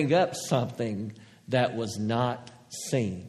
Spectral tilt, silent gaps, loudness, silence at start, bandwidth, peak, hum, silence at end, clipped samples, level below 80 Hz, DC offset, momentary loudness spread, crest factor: -5.5 dB/octave; none; -29 LUFS; 0 s; 13.5 kHz; -10 dBFS; none; 0 s; under 0.1%; -66 dBFS; under 0.1%; 14 LU; 18 dB